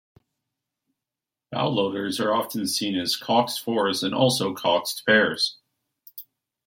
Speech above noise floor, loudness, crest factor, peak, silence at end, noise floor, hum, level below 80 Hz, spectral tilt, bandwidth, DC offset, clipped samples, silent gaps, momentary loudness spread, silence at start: 65 dB; -23 LUFS; 20 dB; -6 dBFS; 0.45 s; -88 dBFS; none; -70 dBFS; -3.5 dB/octave; 16.5 kHz; under 0.1%; under 0.1%; none; 11 LU; 1.5 s